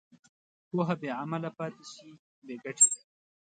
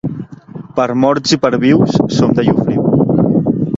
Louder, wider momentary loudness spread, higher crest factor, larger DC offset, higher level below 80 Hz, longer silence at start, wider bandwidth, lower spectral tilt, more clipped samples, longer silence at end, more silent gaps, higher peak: second, -28 LUFS vs -13 LUFS; first, 24 LU vs 12 LU; first, 24 dB vs 12 dB; neither; second, -84 dBFS vs -44 dBFS; first, 0.75 s vs 0.05 s; first, 9 kHz vs 7.8 kHz; second, -3.5 dB/octave vs -6.5 dB/octave; neither; first, 0.65 s vs 0 s; first, 2.19-2.42 s vs none; second, -10 dBFS vs 0 dBFS